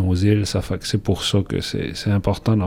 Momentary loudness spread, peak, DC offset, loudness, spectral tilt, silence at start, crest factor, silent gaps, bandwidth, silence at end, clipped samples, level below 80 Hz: 6 LU; -6 dBFS; under 0.1%; -21 LUFS; -6 dB/octave; 0 s; 14 dB; none; 15.5 kHz; 0 s; under 0.1%; -38 dBFS